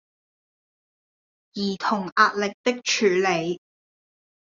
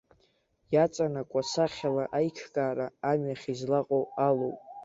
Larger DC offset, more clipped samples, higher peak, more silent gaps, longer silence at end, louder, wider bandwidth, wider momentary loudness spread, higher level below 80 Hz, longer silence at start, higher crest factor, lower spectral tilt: neither; neither; first, -4 dBFS vs -12 dBFS; first, 2.12-2.16 s, 2.54-2.64 s vs none; first, 0.95 s vs 0 s; first, -23 LUFS vs -30 LUFS; about the same, 7.6 kHz vs 8 kHz; first, 11 LU vs 5 LU; about the same, -72 dBFS vs -68 dBFS; first, 1.55 s vs 0.7 s; about the same, 22 dB vs 18 dB; second, -3.5 dB/octave vs -6 dB/octave